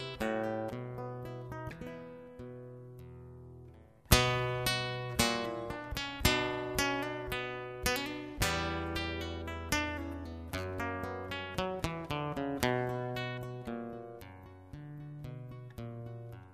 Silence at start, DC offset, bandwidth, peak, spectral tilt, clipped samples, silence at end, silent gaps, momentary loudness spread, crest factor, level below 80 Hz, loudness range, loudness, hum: 0 s; under 0.1%; 14 kHz; -4 dBFS; -4 dB/octave; under 0.1%; 0 s; none; 18 LU; 32 dB; -48 dBFS; 11 LU; -35 LUFS; none